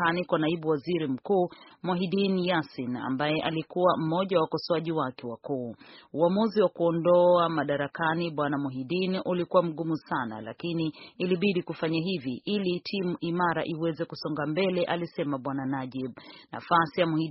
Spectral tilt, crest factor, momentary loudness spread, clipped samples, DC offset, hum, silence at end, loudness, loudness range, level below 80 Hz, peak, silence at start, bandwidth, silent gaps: -5 dB/octave; 20 dB; 9 LU; under 0.1%; under 0.1%; none; 0 s; -28 LUFS; 4 LU; -68 dBFS; -8 dBFS; 0 s; 5.8 kHz; none